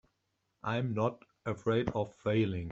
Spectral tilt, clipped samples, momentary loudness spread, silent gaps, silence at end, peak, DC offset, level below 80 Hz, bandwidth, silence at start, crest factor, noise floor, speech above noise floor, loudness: -8 dB/octave; under 0.1%; 9 LU; none; 0 s; -16 dBFS; under 0.1%; -60 dBFS; 7.8 kHz; 0.65 s; 18 dB; -81 dBFS; 48 dB; -34 LUFS